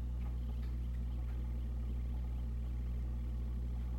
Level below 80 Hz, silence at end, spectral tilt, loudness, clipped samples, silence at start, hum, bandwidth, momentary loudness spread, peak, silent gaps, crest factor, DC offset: -38 dBFS; 0 s; -8.5 dB/octave; -42 LUFS; under 0.1%; 0 s; 60 Hz at -40 dBFS; 4.4 kHz; 0 LU; -30 dBFS; none; 8 dB; under 0.1%